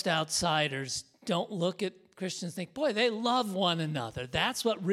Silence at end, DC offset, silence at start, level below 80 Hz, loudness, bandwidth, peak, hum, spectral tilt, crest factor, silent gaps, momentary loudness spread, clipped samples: 0 s; under 0.1%; 0 s; -62 dBFS; -31 LUFS; 16 kHz; -12 dBFS; none; -4 dB/octave; 18 dB; none; 9 LU; under 0.1%